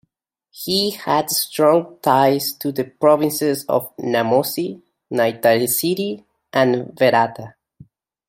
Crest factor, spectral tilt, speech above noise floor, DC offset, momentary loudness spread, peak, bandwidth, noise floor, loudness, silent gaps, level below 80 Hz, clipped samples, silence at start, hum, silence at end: 18 dB; -4 dB/octave; 52 dB; under 0.1%; 9 LU; -2 dBFS; 16.5 kHz; -71 dBFS; -18 LUFS; none; -64 dBFS; under 0.1%; 0.55 s; none; 0.8 s